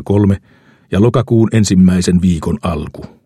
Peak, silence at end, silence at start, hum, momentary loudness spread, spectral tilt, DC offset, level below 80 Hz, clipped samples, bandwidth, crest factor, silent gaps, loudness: 0 dBFS; 0.2 s; 0 s; none; 11 LU; -7 dB/octave; under 0.1%; -34 dBFS; under 0.1%; 12 kHz; 12 dB; none; -13 LUFS